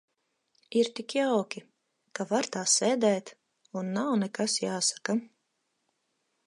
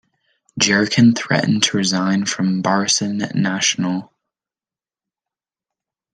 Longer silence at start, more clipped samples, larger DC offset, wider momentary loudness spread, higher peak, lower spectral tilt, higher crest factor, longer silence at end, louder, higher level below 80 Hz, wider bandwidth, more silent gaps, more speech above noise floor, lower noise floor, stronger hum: first, 0.7 s vs 0.55 s; neither; neither; first, 13 LU vs 7 LU; second, -12 dBFS vs 0 dBFS; about the same, -3 dB/octave vs -3.5 dB/octave; about the same, 20 dB vs 20 dB; second, 1.2 s vs 2.1 s; second, -28 LUFS vs -17 LUFS; second, -84 dBFS vs -62 dBFS; about the same, 11.5 kHz vs 10.5 kHz; neither; second, 50 dB vs over 73 dB; second, -78 dBFS vs under -90 dBFS; neither